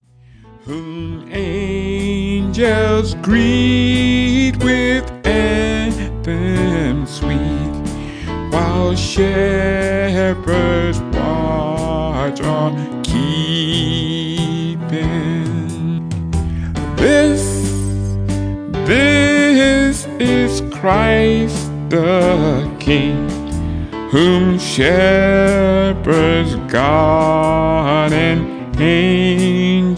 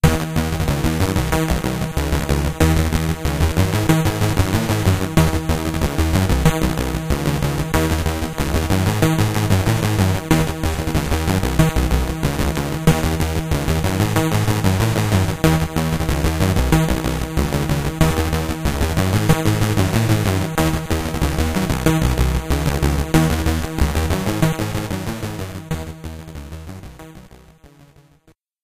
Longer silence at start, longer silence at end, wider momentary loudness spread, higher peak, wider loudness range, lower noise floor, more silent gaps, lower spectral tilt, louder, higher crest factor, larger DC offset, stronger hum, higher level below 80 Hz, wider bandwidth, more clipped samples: first, 0.5 s vs 0.05 s; second, 0 s vs 1.35 s; first, 10 LU vs 6 LU; about the same, 0 dBFS vs 0 dBFS; about the same, 5 LU vs 3 LU; second, -43 dBFS vs -56 dBFS; neither; about the same, -6 dB/octave vs -5.5 dB/octave; first, -15 LUFS vs -19 LUFS; about the same, 14 dB vs 18 dB; neither; neither; about the same, -28 dBFS vs -26 dBFS; second, 10.5 kHz vs 16 kHz; neither